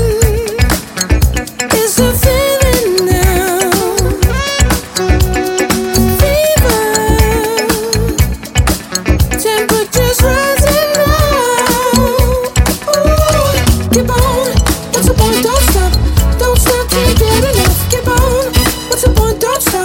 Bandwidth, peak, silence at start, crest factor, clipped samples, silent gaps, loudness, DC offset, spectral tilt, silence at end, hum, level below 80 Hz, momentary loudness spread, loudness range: 17 kHz; 0 dBFS; 0 s; 10 dB; under 0.1%; none; -11 LUFS; under 0.1%; -4.5 dB/octave; 0 s; none; -16 dBFS; 3 LU; 1 LU